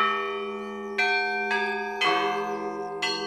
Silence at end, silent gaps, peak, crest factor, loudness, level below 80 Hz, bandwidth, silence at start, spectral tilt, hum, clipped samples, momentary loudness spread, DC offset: 0 s; none; -12 dBFS; 16 dB; -26 LUFS; -66 dBFS; 13.5 kHz; 0 s; -2.5 dB/octave; none; under 0.1%; 9 LU; under 0.1%